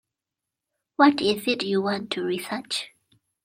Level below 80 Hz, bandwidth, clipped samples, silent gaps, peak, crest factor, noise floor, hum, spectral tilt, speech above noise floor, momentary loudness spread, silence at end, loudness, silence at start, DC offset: -68 dBFS; 16 kHz; under 0.1%; none; -4 dBFS; 22 dB; -87 dBFS; none; -4.5 dB/octave; 63 dB; 11 LU; 0.55 s; -24 LUFS; 1 s; under 0.1%